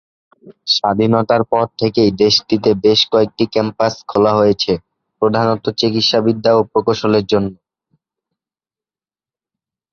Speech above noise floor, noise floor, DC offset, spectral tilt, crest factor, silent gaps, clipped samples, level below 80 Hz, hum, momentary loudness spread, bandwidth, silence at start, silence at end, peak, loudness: over 76 dB; under -90 dBFS; under 0.1%; -5.5 dB/octave; 16 dB; none; under 0.1%; -50 dBFS; none; 5 LU; 7 kHz; 0.45 s; 2.4 s; 0 dBFS; -15 LUFS